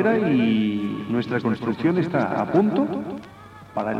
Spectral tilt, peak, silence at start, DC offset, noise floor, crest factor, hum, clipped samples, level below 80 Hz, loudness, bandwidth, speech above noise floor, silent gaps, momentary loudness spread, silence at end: -8.5 dB/octave; -8 dBFS; 0 s; under 0.1%; -43 dBFS; 16 dB; none; under 0.1%; -60 dBFS; -22 LUFS; 7.6 kHz; 22 dB; none; 12 LU; 0 s